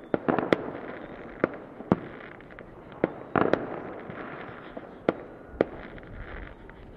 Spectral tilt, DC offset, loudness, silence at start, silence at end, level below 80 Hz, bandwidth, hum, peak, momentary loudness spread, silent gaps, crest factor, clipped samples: -8 dB/octave; under 0.1%; -31 LUFS; 0 s; 0 s; -52 dBFS; 8.2 kHz; none; -2 dBFS; 18 LU; none; 28 dB; under 0.1%